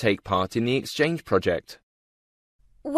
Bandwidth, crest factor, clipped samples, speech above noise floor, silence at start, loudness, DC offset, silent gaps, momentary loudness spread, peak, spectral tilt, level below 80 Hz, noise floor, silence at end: 14 kHz; 18 dB; under 0.1%; over 65 dB; 0 s; -25 LUFS; under 0.1%; 1.83-2.59 s; 6 LU; -8 dBFS; -5.5 dB/octave; -56 dBFS; under -90 dBFS; 0 s